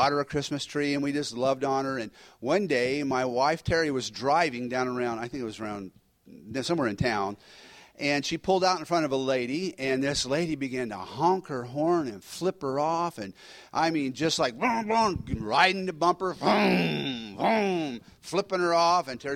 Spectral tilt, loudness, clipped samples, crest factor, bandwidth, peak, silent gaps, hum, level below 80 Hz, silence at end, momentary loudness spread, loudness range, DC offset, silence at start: -4.5 dB/octave; -27 LUFS; under 0.1%; 20 dB; 16 kHz; -8 dBFS; none; none; -56 dBFS; 0 s; 11 LU; 4 LU; under 0.1%; 0 s